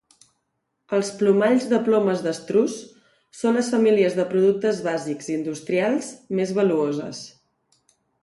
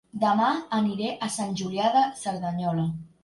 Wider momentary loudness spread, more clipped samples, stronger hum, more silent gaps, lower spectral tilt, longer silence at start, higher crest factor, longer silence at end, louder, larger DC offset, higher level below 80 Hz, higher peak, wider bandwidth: about the same, 9 LU vs 7 LU; neither; neither; neither; about the same, -5.5 dB/octave vs -5.5 dB/octave; first, 0.9 s vs 0.15 s; about the same, 16 dB vs 16 dB; first, 0.95 s vs 0.15 s; first, -22 LUFS vs -26 LUFS; neither; second, -70 dBFS vs -64 dBFS; first, -6 dBFS vs -10 dBFS; about the same, 11.5 kHz vs 11.5 kHz